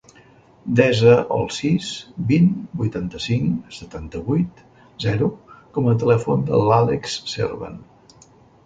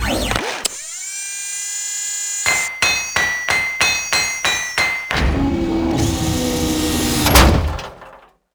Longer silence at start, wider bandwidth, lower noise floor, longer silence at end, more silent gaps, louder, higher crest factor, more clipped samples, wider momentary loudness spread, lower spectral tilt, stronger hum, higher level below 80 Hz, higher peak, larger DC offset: first, 0.65 s vs 0 s; second, 9.2 kHz vs over 20 kHz; first, -50 dBFS vs -44 dBFS; first, 0.85 s vs 0.4 s; neither; second, -20 LUFS vs -17 LUFS; about the same, 18 dB vs 18 dB; neither; first, 14 LU vs 9 LU; first, -6.5 dB/octave vs -3 dB/octave; neither; second, -48 dBFS vs -26 dBFS; about the same, -2 dBFS vs 0 dBFS; neither